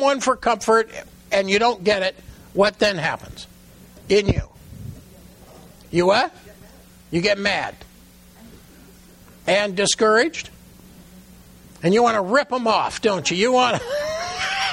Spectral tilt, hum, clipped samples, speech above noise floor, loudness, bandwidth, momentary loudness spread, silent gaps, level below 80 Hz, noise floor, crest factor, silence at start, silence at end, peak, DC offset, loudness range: -4 dB/octave; none; under 0.1%; 29 dB; -20 LUFS; 16.5 kHz; 15 LU; none; -44 dBFS; -48 dBFS; 16 dB; 0 s; 0 s; -6 dBFS; under 0.1%; 5 LU